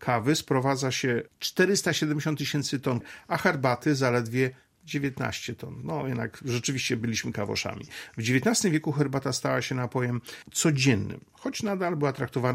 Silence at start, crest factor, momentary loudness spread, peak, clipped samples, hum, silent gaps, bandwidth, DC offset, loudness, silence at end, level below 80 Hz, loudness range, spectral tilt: 0 s; 20 dB; 10 LU; -6 dBFS; under 0.1%; none; none; 16 kHz; under 0.1%; -27 LUFS; 0 s; -62 dBFS; 4 LU; -4.5 dB/octave